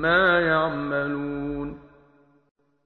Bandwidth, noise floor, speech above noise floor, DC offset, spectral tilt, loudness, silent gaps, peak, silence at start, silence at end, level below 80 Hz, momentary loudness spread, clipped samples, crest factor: 4.7 kHz; -59 dBFS; 37 dB; under 0.1%; -8 dB/octave; -23 LUFS; none; -8 dBFS; 0 s; 1.05 s; -50 dBFS; 16 LU; under 0.1%; 18 dB